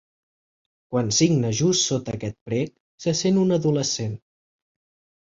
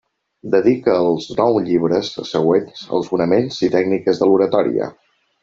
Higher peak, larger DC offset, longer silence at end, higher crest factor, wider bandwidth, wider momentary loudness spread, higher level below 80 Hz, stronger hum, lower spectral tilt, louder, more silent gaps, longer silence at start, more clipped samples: second, -6 dBFS vs -2 dBFS; neither; first, 1.05 s vs 0.5 s; about the same, 18 dB vs 14 dB; about the same, 7.8 kHz vs 7.6 kHz; first, 12 LU vs 8 LU; about the same, -56 dBFS vs -56 dBFS; neither; second, -4.5 dB/octave vs -6.5 dB/octave; second, -23 LUFS vs -17 LUFS; first, 2.41-2.46 s, 2.80-2.98 s vs none; first, 0.9 s vs 0.45 s; neither